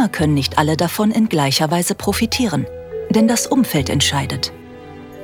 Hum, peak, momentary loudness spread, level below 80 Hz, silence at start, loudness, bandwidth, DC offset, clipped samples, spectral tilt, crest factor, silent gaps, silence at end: none; -2 dBFS; 13 LU; -42 dBFS; 0 s; -17 LUFS; 18 kHz; under 0.1%; under 0.1%; -4.5 dB/octave; 16 dB; none; 0 s